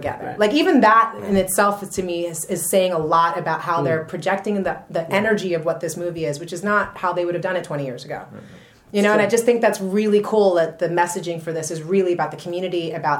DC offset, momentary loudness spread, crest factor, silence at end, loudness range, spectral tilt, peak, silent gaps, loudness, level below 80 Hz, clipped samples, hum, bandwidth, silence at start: under 0.1%; 10 LU; 16 dB; 0 s; 4 LU; -4.5 dB/octave; -4 dBFS; none; -20 LUFS; -56 dBFS; under 0.1%; none; 17 kHz; 0 s